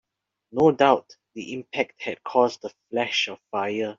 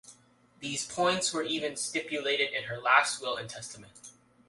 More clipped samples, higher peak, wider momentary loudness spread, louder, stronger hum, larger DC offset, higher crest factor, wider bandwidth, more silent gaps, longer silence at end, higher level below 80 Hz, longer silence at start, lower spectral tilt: neither; first, -4 dBFS vs -8 dBFS; about the same, 15 LU vs 17 LU; first, -24 LUFS vs -29 LUFS; neither; neither; about the same, 22 dB vs 24 dB; second, 7.6 kHz vs 11.5 kHz; neither; second, 0.05 s vs 0.35 s; first, -66 dBFS vs -72 dBFS; first, 0.55 s vs 0.05 s; about the same, -2.5 dB/octave vs -2 dB/octave